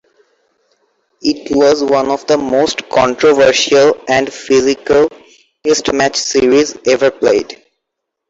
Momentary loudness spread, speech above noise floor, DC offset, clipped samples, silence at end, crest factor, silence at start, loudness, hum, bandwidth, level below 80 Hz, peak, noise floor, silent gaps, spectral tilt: 7 LU; 64 dB; under 0.1%; under 0.1%; 0.75 s; 12 dB; 1.25 s; -12 LUFS; none; 8 kHz; -48 dBFS; -2 dBFS; -76 dBFS; none; -3 dB/octave